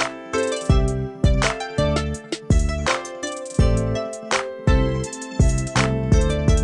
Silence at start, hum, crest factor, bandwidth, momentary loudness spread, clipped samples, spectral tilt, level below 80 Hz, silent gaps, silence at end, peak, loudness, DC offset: 0 s; none; 16 dB; 11.5 kHz; 7 LU; under 0.1%; -5.5 dB/octave; -24 dBFS; none; 0 s; -4 dBFS; -22 LUFS; under 0.1%